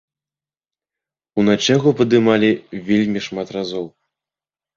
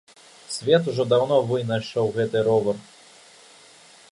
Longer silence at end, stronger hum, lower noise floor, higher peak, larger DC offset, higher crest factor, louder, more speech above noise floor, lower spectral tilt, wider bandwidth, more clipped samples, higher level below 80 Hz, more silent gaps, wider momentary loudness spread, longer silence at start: second, 0.9 s vs 1.3 s; neither; first, under -90 dBFS vs -50 dBFS; first, -2 dBFS vs -6 dBFS; neither; about the same, 18 dB vs 18 dB; first, -17 LUFS vs -22 LUFS; first, over 73 dB vs 29 dB; about the same, -5.5 dB/octave vs -5.5 dB/octave; second, 7.4 kHz vs 11.5 kHz; neither; first, -56 dBFS vs -64 dBFS; neither; first, 12 LU vs 9 LU; first, 1.35 s vs 0.5 s